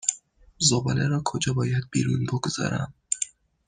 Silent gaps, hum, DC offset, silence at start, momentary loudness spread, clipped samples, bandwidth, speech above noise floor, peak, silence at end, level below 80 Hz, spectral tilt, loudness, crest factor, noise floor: none; none; under 0.1%; 0.05 s; 8 LU; under 0.1%; 10 kHz; 22 dB; -4 dBFS; 0.4 s; -56 dBFS; -4 dB/octave; -26 LUFS; 22 dB; -47 dBFS